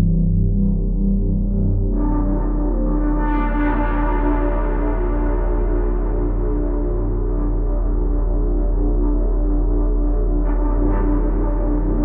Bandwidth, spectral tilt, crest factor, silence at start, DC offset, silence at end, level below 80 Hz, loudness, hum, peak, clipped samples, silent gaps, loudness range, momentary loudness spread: 2.8 kHz; -10 dB/octave; 10 dB; 0 s; under 0.1%; 0 s; -18 dBFS; -21 LUFS; none; -6 dBFS; under 0.1%; none; 2 LU; 3 LU